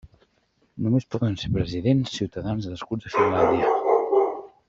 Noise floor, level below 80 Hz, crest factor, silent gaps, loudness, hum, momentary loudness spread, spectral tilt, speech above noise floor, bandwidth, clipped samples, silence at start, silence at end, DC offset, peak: -67 dBFS; -50 dBFS; 16 dB; none; -24 LUFS; none; 9 LU; -7.5 dB/octave; 43 dB; 7.6 kHz; under 0.1%; 0.05 s; 0.2 s; under 0.1%; -6 dBFS